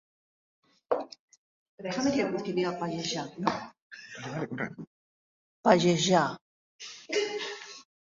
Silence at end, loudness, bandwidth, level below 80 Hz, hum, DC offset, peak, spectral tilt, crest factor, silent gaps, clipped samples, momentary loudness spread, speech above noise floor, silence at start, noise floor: 0.3 s; -29 LUFS; 7.8 kHz; -68 dBFS; none; under 0.1%; -6 dBFS; -4.5 dB/octave; 26 dB; 1.19-1.28 s, 1.37-1.78 s, 3.82-3.91 s, 4.87-5.63 s, 6.41-6.79 s; under 0.1%; 22 LU; over 62 dB; 0.9 s; under -90 dBFS